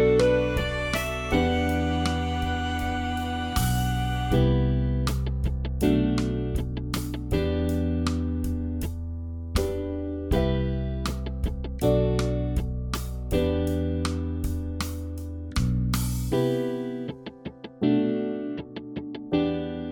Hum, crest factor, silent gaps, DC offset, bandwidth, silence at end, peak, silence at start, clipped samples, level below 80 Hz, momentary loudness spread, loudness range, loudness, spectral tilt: none; 18 dB; none; under 0.1%; 19 kHz; 0 s; -8 dBFS; 0 s; under 0.1%; -32 dBFS; 9 LU; 3 LU; -27 LUFS; -6.5 dB/octave